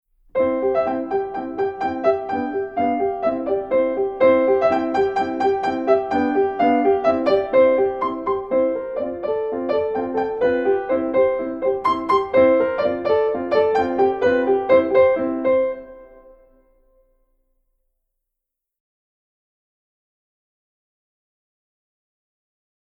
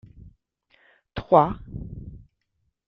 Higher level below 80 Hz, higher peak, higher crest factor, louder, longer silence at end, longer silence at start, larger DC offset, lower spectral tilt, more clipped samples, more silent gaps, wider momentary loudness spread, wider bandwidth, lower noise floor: second, -54 dBFS vs -48 dBFS; about the same, -4 dBFS vs -2 dBFS; second, 18 dB vs 24 dB; about the same, -20 LUFS vs -21 LUFS; first, 6.75 s vs 0.7 s; second, 0.35 s vs 1.15 s; neither; second, -7 dB/octave vs -10 dB/octave; neither; neither; second, 8 LU vs 22 LU; first, 6.8 kHz vs 5.8 kHz; first, -83 dBFS vs -75 dBFS